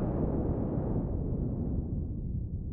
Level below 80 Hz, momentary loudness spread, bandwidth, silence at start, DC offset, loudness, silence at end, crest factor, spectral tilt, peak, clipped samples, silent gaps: -38 dBFS; 5 LU; 2.6 kHz; 0 s; under 0.1%; -34 LUFS; 0 s; 12 dB; -13.5 dB/octave; -20 dBFS; under 0.1%; none